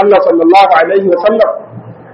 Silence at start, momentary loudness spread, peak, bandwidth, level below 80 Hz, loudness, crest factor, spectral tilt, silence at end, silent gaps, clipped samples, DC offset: 0 s; 7 LU; 0 dBFS; 8.6 kHz; -52 dBFS; -8 LUFS; 8 dB; -6.5 dB/octave; 0.2 s; none; 0.4%; under 0.1%